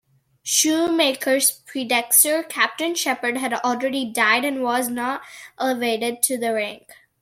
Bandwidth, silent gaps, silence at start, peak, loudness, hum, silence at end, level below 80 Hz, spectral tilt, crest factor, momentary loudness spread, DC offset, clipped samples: 16.5 kHz; none; 0.45 s; 0 dBFS; -20 LUFS; none; 0.45 s; -70 dBFS; -0.5 dB/octave; 22 dB; 10 LU; under 0.1%; under 0.1%